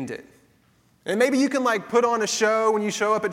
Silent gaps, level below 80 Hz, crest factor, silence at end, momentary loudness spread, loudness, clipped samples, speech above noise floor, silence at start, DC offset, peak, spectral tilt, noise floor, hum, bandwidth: none; -70 dBFS; 16 dB; 0 s; 12 LU; -22 LUFS; under 0.1%; 39 dB; 0 s; under 0.1%; -6 dBFS; -3.5 dB/octave; -61 dBFS; none; 16 kHz